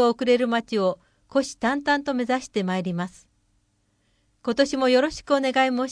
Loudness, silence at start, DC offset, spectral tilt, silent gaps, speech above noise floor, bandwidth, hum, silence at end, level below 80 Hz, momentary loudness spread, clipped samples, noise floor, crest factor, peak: -23 LUFS; 0 s; under 0.1%; -5 dB/octave; none; 45 dB; 10.5 kHz; none; 0 s; -58 dBFS; 9 LU; under 0.1%; -68 dBFS; 18 dB; -6 dBFS